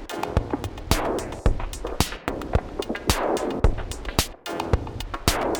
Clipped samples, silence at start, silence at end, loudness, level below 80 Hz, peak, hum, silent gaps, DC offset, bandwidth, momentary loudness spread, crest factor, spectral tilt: under 0.1%; 0 s; 0 s; -27 LUFS; -30 dBFS; 0 dBFS; none; none; under 0.1%; 19 kHz; 7 LU; 24 dB; -4.5 dB/octave